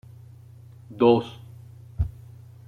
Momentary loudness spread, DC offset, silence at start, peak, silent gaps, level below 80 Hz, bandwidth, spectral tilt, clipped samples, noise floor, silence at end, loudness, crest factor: 26 LU; under 0.1%; 0.9 s; -6 dBFS; none; -42 dBFS; 10 kHz; -8.5 dB/octave; under 0.1%; -47 dBFS; 0.55 s; -23 LUFS; 22 dB